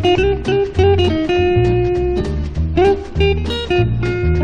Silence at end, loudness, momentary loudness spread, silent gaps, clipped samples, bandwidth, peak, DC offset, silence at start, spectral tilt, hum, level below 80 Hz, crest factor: 0 s; -16 LUFS; 5 LU; none; under 0.1%; 8.8 kHz; -2 dBFS; under 0.1%; 0 s; -7.5 dB/octave; none; -24 dBFS; 14 dB